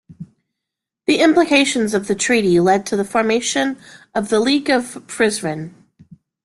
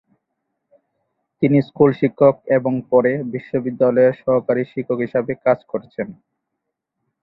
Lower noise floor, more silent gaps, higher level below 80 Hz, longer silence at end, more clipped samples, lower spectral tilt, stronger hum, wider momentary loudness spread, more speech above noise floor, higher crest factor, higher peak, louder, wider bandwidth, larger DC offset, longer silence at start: first, -83 dBFS vs -79 dBFS; neither; about the same, -56 dBFS vs -60 dBFS; second, 0.75 s vs 1.1 s; neither; second, -4 dB/octave vs -11.5 dB/octave; neither; about the same, 12 LU vs 10 LU; first, 66 dB vs 61 dB; about the same, 16 dB vs 18 dB; about the same, -2 dBFS vs -2 dBFS; about the same, -17 LUFS vs -18 LUFS; first, 12.5 kHz vs 5.2 kHz; neither; second, 0.2 s vs 1.4 s